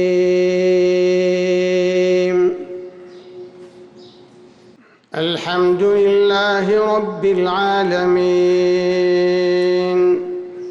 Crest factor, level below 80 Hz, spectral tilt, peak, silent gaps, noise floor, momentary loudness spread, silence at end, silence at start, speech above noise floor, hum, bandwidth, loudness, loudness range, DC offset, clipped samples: 8 dB; -58 dBFS; -6 dB/octave; -8 dBFS; none; -48 dBFS; 13 LU; 0 s; 0 s; 33 dB; none; 7.6 kHz; -16 LUFS; 7 LU; under 0.1%; under 0.1%